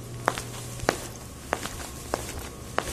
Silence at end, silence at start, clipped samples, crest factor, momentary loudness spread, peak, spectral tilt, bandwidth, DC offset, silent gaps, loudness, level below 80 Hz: 0 s; 0 s; under 0.1%; 32 dB; 8 LU; 0 dBFS; -3.5 dB/octave; 14 kHz; under 0.1%; none; -32 LUFS; -46 dBFS